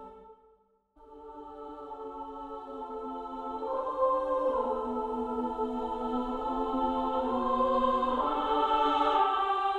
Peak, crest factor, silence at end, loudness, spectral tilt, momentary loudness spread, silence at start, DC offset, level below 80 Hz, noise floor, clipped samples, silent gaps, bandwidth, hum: -14 dBFS; 18 dB; 0 s; -30 LUFS; -5.5 dB/octave; 16 LU; 0 s; under 0.1%; -54 dBFS; -66 dBFS; under 0.1%; none; 9 kHz; none